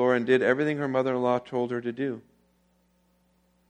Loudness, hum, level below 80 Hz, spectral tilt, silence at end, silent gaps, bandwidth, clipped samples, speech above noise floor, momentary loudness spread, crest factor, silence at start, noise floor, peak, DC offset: -26 LUFS; 60 Hz at -60 dBFS; -70 dBFS; -7 dB/octave; 1.5 s; none; 9 kHz; under 0.1%; 41 dB; 10 LU; 20 dB; 0 s; -67 dBFS; -8 dBFS; under 0.1%